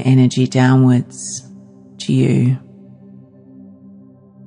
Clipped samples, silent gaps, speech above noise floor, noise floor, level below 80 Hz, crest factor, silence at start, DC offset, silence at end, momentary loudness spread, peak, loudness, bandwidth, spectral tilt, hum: under 0.1%; none; 29 dB; -43 dBFS; -66 dBFS; 14 dB; 0 s; under 0.1%; 1.9 s; 15 LU; -2 dBFS; -15 LUFS; 10.5 kHz; -6.5 dB/octave; none